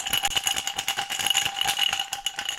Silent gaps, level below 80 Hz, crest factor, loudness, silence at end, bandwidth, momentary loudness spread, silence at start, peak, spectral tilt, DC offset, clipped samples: none; -54 dBFS; 22 dB; -24 LUFS; 0 s; 17 kHz; 5 LU; 0 s; -6 dBFS; 1.5 dB/octave; under 0.1%; under 0.1%